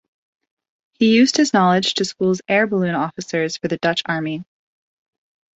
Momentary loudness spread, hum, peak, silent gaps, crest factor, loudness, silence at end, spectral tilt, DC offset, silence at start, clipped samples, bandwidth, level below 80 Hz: 9 LU; none; -4 dBFS; none; 16 dB; -18 LUFS; 1.15 s; -4.5 dB/octave; under 0.1%; 1 s; under 0.1%; 8.2 kHz; -62 dBFS